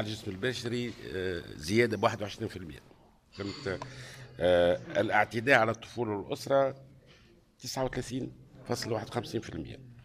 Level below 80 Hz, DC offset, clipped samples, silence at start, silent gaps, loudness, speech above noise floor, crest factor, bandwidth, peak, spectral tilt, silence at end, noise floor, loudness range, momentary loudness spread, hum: -58 dBFS; under 0.1%; under 0.1%; 0 s; none; -31 LUFS; 29 dB; 24 dB; 15.5 kHz; -8 dBFS; -5 dB/octave; 0 s; -60 dBFS; 6 LU; 18 LU; none